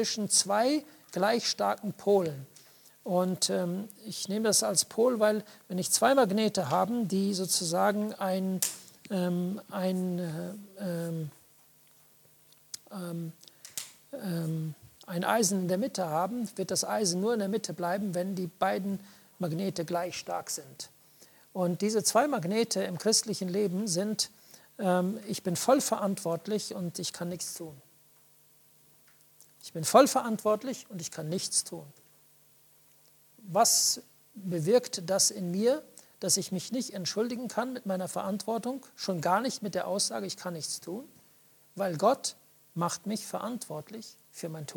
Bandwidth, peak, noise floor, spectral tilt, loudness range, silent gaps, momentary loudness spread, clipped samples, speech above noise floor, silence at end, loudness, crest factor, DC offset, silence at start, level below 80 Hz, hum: 19 kHz; -8 dBFS; -62 dBFS; -3.5 dB/octave; 8 LU; none; 15 LU; under 0.1%; 32 dB; 0 s; -30 LUFS; 24 dB; under 0.1%; 0 s; -78 dBFS; none